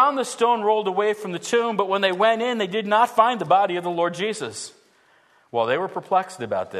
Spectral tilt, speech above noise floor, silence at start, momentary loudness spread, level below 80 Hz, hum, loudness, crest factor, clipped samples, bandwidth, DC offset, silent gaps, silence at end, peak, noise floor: -4 dB/octave; 37 dB; 0 s; 9 LU; -76 dBFS; none; -22 LUFS; 18 dB; under 0.1%; 13.5 kHz; under 0.1%; none; 0 s; -4 dBFS; -58 dBFS